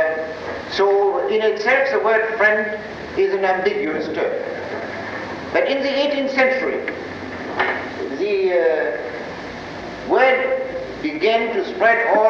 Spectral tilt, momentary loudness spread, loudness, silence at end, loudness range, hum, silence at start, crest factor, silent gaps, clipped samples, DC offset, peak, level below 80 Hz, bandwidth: -5 dB/octave; 12 LU; -19 LUFS; 0 s; 4 LU; none; 0 s; 16 dB; none; under 0.1%; under 0.1%; -4 dBFS; -52 dBFS; 7.2 kHz